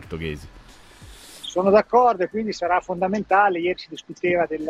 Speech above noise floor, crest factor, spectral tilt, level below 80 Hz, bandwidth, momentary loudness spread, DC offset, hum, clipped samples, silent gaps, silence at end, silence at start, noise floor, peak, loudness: 23 dB; 18 dB; -5.5 dB/octave; -50 dBFS; 14 kHz; 16 LU; under 0.1%; none; under 0.1%; none; 0 s; 0 s; -44 dBFS; -4 dBFS; -21 LUFS